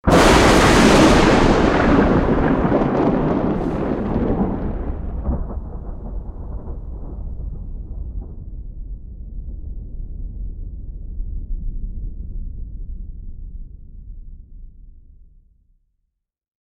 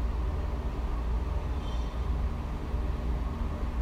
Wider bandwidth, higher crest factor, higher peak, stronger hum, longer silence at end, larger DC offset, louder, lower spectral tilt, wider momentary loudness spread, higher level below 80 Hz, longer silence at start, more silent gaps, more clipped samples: first, 15.5 kHz vs 7.2 kHz; first, 20 dB vs 10 dB; first, 0 dBFS vs -20 dBFS; neither; first, 1.8 s vs 0 s; neither; first, -16 LUFS vs -34 LUFS; second, -5.5 dB/octave vs -7.5 dB/octave; first, 24 LU vs 2 LU; first, -26 dBFS vs -32 dBFS; about the same, 0.05 s vs 0 s; neither; neither